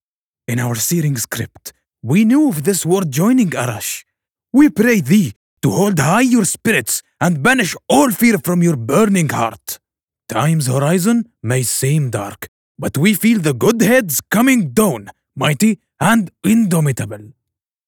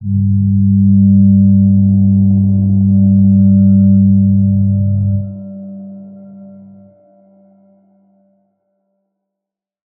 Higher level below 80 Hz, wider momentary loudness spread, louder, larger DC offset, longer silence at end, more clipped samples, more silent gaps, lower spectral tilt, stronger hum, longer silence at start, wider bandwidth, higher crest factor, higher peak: second, -54 dBFS vs -44 dBFS; second, 13 LU vs 17 LU; second, -15 LUFS vs -10 LUFS; neither; second, 0.6 s vs 3.5 s; neither; first, 5.36-5.57 s, 10.03-10.08 s, 12.48-12.75 s vs none; second, -5 dB/octave vs -19 dB/octave; neither; first, 0.5 s vs 0 s; first, 19 kHz vs 0.8 kHz; about the same, 14 dB vs 10 dB; about the same, -2 dBFS vs -2 dBFS